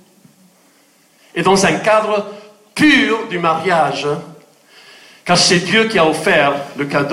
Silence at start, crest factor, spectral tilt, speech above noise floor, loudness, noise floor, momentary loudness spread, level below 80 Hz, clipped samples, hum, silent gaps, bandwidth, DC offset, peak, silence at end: 1.35 s; 14 dB; -3.5 dB/octave; 38 dB; -14 LUFS; -52 dBFS; 11 LU; -52 dBFS; under 0.1%; none; none; 15.5 kHz; under 0.1%; -2 dBFS; 0 s